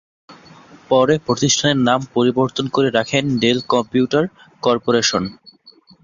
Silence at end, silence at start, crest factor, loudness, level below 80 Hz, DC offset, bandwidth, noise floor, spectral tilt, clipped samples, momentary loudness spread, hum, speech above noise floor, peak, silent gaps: 0.7 s; 0.3 s; 16 dB; -17 LUFS; -54 dBFS; under 0.1%; 7.6 kHz; -49 dBFS; -4 dB/octave; under 0.1%; 5 LU; none; 32 dB; -2 dBFS; none